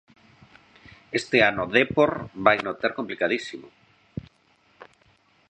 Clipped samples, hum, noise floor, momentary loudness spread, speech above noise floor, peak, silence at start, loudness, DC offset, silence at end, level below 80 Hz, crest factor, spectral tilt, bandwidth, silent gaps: under 0.1%; none; -63 dBFS; 20 LU; 39 dB; -2 dBFS; 1.1 s; -23 LUFS; under 0.1%; 0.65 s; -58 dBFS; 24 dB; -5 dB/octave; 9 kHz; none